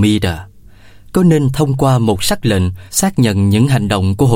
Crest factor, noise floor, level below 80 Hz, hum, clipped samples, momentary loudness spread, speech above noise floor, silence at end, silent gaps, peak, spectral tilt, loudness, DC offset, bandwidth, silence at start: 12 dB; -39 dBFS; -36 dBFS; none; under 0.1%; 5 LU; 26 dB; 0 s; none; 0 dBFS; -5.5 dB/octave; -14 LUFS; under 0.1%; 16.5 kHz; 0 s